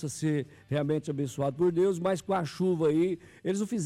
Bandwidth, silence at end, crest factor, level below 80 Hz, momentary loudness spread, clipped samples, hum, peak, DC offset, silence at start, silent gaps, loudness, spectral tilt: 14 kHz; 0 s; 10 dB; -66 dBFS; 8 LU; under 0.1%; none; -18 dBFS; under 0.1%; 0 s; none; -29 LUFS; -6.5 dB/octave